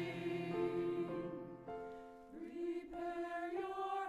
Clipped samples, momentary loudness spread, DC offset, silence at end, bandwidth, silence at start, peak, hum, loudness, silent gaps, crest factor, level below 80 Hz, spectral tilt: under 0.1%; 11 LU; under 0.1%; 0 s; 11 kHz; 0 s; -28 dBFS; none; -43 LUFS; none; 14 dB; -72 dBFS; -7 dB/octave